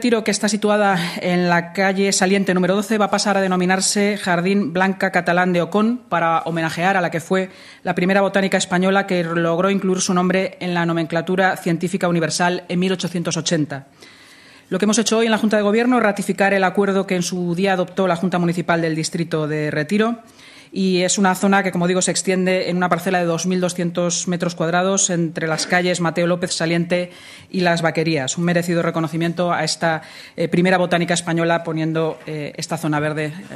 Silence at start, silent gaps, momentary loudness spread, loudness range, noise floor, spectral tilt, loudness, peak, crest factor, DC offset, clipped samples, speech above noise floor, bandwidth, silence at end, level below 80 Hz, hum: 0 s; none; 6 LU; 3 LU; -46 dBFS; -4.5 dB/octave; -19 LUFS; 0 dBFS; 18 dB; under 0.1%; under 0.1%; 27 dB; 14 kHz; 0 s; -62 dBFS; none